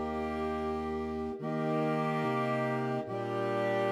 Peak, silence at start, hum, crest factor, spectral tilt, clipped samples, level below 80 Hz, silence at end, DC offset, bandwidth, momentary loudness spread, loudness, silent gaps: -20 dBFS; 0 s; none; 12 dB; -7.5 dB/octave; under 0.1%; -58 dBFS; 0 s; under 0.1%; 13.5 kHz; 5 LU; -33 LUFS; none